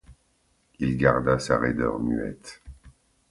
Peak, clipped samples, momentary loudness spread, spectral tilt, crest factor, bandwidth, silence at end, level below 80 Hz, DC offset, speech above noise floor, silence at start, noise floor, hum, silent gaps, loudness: -4 dBFS; under 0.1%; 21 LU; -6.5 dB/octave; 22 dB; 11.5 kHz; 0.4 s; -46 dBFS; under 0.1%; 43 dB; 0.1 s; -67 dBFS; none; none; -25 LUFS